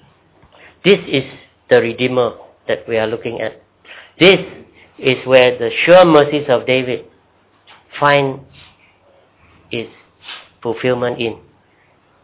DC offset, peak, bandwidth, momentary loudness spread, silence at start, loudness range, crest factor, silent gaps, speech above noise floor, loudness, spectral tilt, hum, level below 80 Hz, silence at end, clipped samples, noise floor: under 0.1%; 0 dBFS; 4 kHz; 19 LU; 0.85 s; 12 LU; 16 dB; none; 41 dB; -14 LUFS; -9.5 dB/octave; none; -54 dBFS; 0.9 s; under 0.1%; -54 dBFS